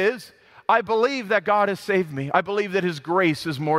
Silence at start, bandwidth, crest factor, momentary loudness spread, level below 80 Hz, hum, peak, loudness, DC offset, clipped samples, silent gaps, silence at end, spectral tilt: 0 s; 15.5 kHz; 18 dB; 5 LU; -66 dBFS; none; -4 dBFS; -22 LUFS; under 0.1%; under 0.1%; none; 0 s; -6 dB/octave